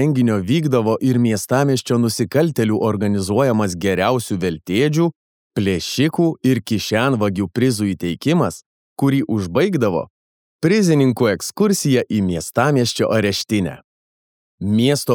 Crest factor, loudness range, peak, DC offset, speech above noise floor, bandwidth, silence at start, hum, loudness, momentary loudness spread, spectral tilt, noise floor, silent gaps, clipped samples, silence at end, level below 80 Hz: 16 dB; 2 LU; -2 dBFS; under 0.1%; over 73 dB; 19 kHz; 0 s; none; -18 LUFS; 5 LU; -6 dB/octave; under -90 dBFS; 5.16-5.50 s, 8.66-8.96 s, 10.10-10.59 s, 13.84-14.58 s; under 0.1%; 0 s; -54 dBFS